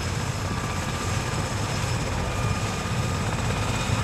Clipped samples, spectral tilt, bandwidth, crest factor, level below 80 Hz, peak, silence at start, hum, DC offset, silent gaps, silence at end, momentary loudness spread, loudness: under 0.1%; -4.5 dB/octave; 15 kHz; 16 dB; -36 dBFS; -10 dBFS; 0 s; none; under 0.1%; none; 0 s; 2 LU; -27 LUFS